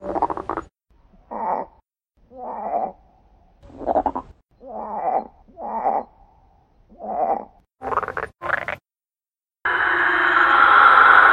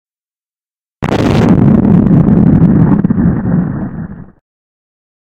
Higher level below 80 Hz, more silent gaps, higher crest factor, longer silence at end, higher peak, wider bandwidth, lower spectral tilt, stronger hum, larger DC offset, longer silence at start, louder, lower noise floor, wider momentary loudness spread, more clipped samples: second, -52 dBFS vs -28 dBFS; neither; first, 22 dB vs 10 dB; second, 0 s vs 1.15 s; about the same, 0 dBFS vs 0 dBFS; first, 9.8 kHz vs 8 kHz; second, -4.5 dB/octave vs -9.5 dB/octave; neither; neither; second, 0 s vs 1 s; second, -19 LUFS vs -9 LUFS; about the same, under -90 dBFS vs under -90 dBFS; first, 23 LU vs 13 LU; second, under 0.1% vs 0.8%